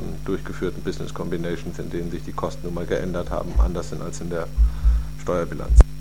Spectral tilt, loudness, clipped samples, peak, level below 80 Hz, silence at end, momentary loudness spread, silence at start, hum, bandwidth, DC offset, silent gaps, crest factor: -7 dB/octave; -26 LUFS; under 0.1%; 0 dBFS; -22 dBFS; 0 s; 10 LU; 0 s; none; 11 kHz; 3%; none; 22 dB